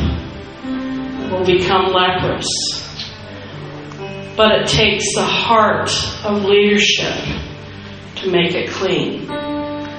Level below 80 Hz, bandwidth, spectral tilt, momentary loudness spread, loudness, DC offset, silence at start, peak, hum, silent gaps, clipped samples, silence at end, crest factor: -36 dBFS; 9.4 kHz; -3.5 dB/octave; 18 LU; -16 LUFS; under 0.1%; 0 s; 0 dBFS; none; none; under 0.1%; 0 s; 18 dB